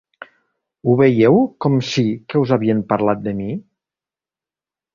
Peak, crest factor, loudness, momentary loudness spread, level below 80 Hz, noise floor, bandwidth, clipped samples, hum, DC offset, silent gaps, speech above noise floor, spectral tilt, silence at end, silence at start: -2 dBFS; 16 dB; -17 LUFS; 11 LU; -54 dBFS; under -90 dBFS; 7.4 kHz; under 0.1%; none; under 0.1%; none; over 74 dB; -7.5 dB/octave; 1.35 s; 0.85 s